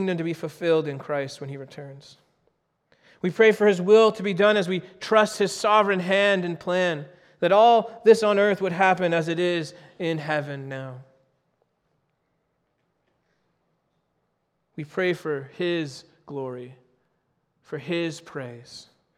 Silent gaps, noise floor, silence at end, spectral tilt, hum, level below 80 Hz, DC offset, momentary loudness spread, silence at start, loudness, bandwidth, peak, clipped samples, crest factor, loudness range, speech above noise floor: none; -74 dBFS; 0.35 s; -5.5 dB/octave; none; -72 dBFS; under 0.1%; 20 LU; 0 s; -22 LUFS; 13 kHz; -4 dBFS; under 0.1%; 20 dB; 13 LU; 51 dB